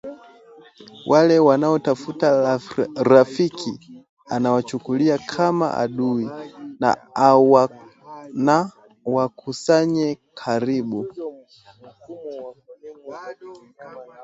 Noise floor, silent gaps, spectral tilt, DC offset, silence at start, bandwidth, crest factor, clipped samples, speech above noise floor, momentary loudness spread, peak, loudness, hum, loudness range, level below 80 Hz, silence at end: -49 dBFS; 4.09-4.17 s; -6.5 dB/octave; under 0.1%; 0.05 s; 8 kHz; 20 dB; under 0.1%; 30 dB; 22 LU; 0 dBFS; -19 LUFS; none; 11 LU; -64 dBFS; 0 s